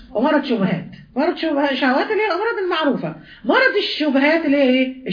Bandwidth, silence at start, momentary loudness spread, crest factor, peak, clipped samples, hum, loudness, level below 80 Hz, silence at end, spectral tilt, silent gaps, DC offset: 5.2 kHz; 0 s; 8 LU; 16 dB; -2 dBFS; under 0.1%; none; -18 LUFS; -56 dBFS; 0 s; -7 dB/octave; none; under 0.1%